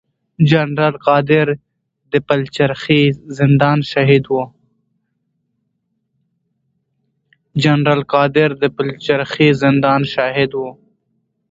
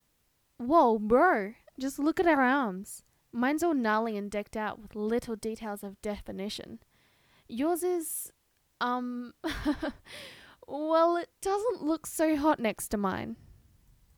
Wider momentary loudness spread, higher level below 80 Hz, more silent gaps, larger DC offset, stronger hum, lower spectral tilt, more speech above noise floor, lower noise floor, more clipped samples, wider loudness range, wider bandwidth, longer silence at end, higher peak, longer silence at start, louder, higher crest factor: second, 8 LU vs 17 LU; about the same, -52 dBFS vs -56 dBFS; neither; neither; neither; first, -7.5 dB/octave vs -4.5 dB/octave; first, 55 dB vs 43 dB; about the same, -70 dBFS vs -73 dBFS; neither; about the same, 6 LU vs 8 LU; second, 7.8 kHz vs over 20 kHz; about the same, 0.8 s vs 0.85 s; first, 0 dBFS vs -12 dBFS; second, 0.4 s vs 0.6 s; first, -15 LUFS vs -30 LUFS; about the same, 16 dB vs 20 dB